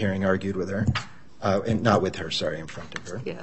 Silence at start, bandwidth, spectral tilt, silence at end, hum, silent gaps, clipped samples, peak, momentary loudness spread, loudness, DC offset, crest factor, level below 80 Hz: 0 s; 8.6 kHz; -6 dB/octave; 0 s; none; none; under 0.1%; -4 dBFS; 13 LU; -26 LUFS; 0.7%; 22 dB; -50 dBFS